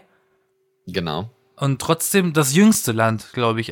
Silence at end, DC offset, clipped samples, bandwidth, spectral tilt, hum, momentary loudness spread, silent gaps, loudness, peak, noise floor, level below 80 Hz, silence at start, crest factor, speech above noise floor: 0 s; under 0.1%; under 0.1%; 18 kHz; -4.5 dB/octave; none; 13 LU; none; -19 LUFS; -2 dBFS; -66 dBFS; -56 dBFS; 0.85 s; 18 dB; 48 dB